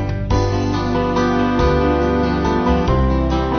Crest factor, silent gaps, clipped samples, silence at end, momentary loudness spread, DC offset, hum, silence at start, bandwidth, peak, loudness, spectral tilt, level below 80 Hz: 14 dB; none; under 0.1%; 0 s; 3 LU; under 0.1%; none; 0 s; 6.6 kHz; -4 dBFS; -17 LUFS; -7.5 dB/octave; -24 dBFS